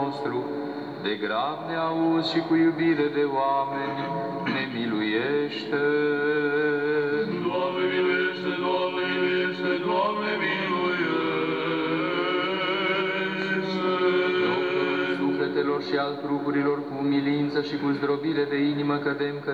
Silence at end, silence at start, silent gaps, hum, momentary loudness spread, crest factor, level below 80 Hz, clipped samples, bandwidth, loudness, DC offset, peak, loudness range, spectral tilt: 0 s; 0 s; none; none; 5 LU; 14 dB; -76 dBFS; under 0.1%; 7.8 kHz; -25 LUFS; under 0.1%; -10 dBFS; 1 LU; -7 dB/octave